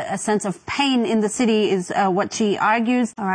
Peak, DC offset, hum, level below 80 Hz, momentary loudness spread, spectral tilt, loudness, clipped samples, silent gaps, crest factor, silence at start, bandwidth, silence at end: -6 dBFS; under 0.1%; none; -60 dBFS; 4 LU; -4.5 dB/octave; -20 LUFS; under 0.1%; none; 14 dB; 0 s; 10.5 kHz; 0 s